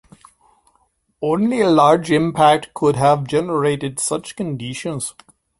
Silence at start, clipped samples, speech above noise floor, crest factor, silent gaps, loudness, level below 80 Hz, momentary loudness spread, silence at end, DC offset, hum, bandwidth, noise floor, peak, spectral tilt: 1.2 s; under 0.1%; 46 dB; 18 dB; none; -18 LUFS; -54 dBFS; 12 LU; 0.5 s; under 0.1%; none; 11.5 kHz; -63 dBFS; -2 dBFS; -5 dB/octave